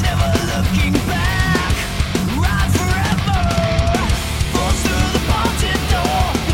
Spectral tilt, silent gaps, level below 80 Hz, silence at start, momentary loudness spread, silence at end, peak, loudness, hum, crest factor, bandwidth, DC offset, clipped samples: -5 dB/octave; none; -22 dBFS; 0 s; 3 LU; 0 s; -4 dBFS; -17 LUFS; none; 12 dB; 16.5 kHz; under 0.1%; under 0.1%